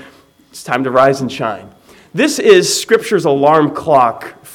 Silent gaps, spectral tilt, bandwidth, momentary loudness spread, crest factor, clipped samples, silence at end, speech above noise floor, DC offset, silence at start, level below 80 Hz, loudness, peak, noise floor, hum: none; -4 dB/octave; 17.5 kHz; 14 LU; 14 dB; 0.3%; 0 s; 32 dB; under 0.1%; 0.55 s; -56 dBFS; -12 LUFS; 0 dBFS; -44 dBFS; none